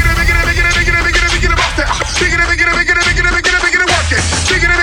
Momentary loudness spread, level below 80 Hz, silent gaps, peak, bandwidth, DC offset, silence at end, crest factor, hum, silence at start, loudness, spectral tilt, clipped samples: 3 LU; -18 dBFS; none; 0 dBFS; 19 kHz; under 0.1%; 0 s; 12 dB; none; 0 s; -11 LUFS; -3 dB/octave; under 0.1%